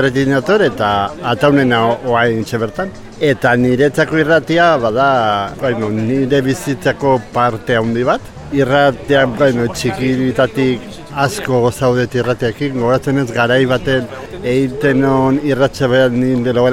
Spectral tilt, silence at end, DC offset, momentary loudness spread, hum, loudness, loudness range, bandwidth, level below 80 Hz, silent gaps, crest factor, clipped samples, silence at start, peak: -6 dB/octave; 0 s; under 0.1%; 6 LU; none; -14 LUFS; 2 LU; 16 kHz; -40 dBFS; none; 14 dB; under 0.1%; 0 s; 0 dBFS